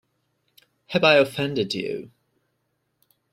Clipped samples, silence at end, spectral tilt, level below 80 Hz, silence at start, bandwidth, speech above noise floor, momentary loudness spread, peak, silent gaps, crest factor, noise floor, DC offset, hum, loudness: under 0.1%; 1.25 s; -5 dB/octave; -66 dBFS; 0.9 s; 14.5 kHz; 53 dB; 14 LU; -4 dBFS; none; 22 dB; -74 dBFS; under 0.1%; none; -21 LUFS